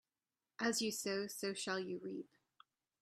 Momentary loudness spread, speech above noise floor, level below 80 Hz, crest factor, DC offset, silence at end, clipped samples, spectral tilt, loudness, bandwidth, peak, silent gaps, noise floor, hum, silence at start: 13 LU; over 49 dB; -84 dBFS; 20 dB; under 0.1%; 0.75 s; under 0.1%; -3 dB/octave; -41 LUFS; 15.5 kHz; -24 dBFS; none; under -90 dBFS; none; 0.6 s